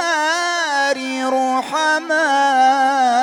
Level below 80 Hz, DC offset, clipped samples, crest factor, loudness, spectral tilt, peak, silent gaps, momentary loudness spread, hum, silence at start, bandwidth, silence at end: -70 dBFS; under 0.1%; under 0.1%; 10 dB; -16 LUFS; -0.5 dB/octave; -6 dBFS; none; 5 LU; 50 Hz at -70 dBFS; 0 s; 16.5 kHz; 0 s